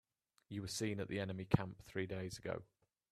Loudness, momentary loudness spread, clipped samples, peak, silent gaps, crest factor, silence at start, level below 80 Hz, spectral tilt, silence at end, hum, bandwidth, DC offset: -43 LUFS; 10 LU; under 0.1%; -16 dBFS; none; 28 dB; 0.5 s; -64 dBFS; -5.5 dB/octave; 0.5 s; none; 14.5 kHz; under 0.1%